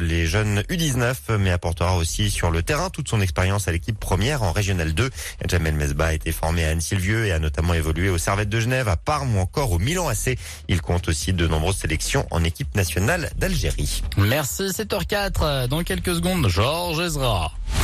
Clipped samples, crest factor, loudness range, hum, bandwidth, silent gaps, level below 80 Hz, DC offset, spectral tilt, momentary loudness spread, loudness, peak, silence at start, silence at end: under 0.1%; 12 dB; 1 LU; none; 14 kHz; none; -30 dBFS; under 0.1%; -4.5 dB/octave; 3 LU; -22 LUFS; -10 dBFS; 0 s; 0 s